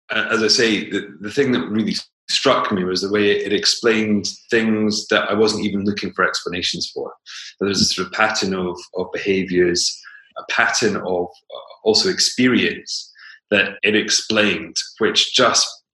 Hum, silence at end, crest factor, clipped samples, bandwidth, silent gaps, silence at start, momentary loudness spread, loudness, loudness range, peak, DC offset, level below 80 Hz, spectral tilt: none; 0.2 s; 18 dB; under 0.1%; 12.5 kHz; 2.13-2.28 s; 0.1 s; 11 LU; -18 LUFS; 3 LU; 0 dBFS; under 0.1%; -60 dBFS; -3 dB/octave